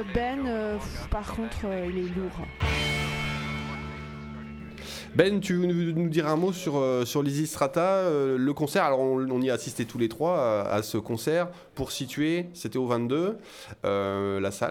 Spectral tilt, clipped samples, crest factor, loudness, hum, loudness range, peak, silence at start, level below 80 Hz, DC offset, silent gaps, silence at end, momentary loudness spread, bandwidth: -5.5 dB/octave; under 0.1%; 22 dB; -28 LUFS; none; 5 LU; -4 dBFS; 0 s; -44 dBFS; under 0.1%; none; 0 s; 11 LU; 18 kHz